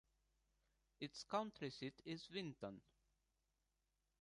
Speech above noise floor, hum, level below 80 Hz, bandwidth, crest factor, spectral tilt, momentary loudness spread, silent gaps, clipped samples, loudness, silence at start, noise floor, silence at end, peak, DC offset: 39 dB; none; -82 dBFS; 11 kHz; 24 dB; -5 dB/octave; 9 LU; none; under 0.1%; -50 LUFS; 1 s; -88 dBFS; 1.4 s; -28 dBFS; under 0.1%